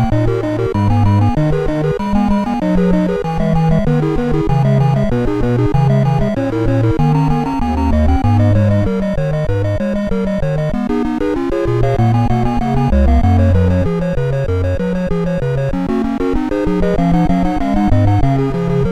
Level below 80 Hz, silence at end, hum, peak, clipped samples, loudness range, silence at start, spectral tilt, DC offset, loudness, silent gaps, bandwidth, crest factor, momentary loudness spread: -22 dBFS; 0 s; none; 0 dBFS; under 0.1%; 2 LU; 0 s; -9 dB/octave; under 0.1%; -15 LUFS; none; 9.8 kHz; 14 dB; 5 LU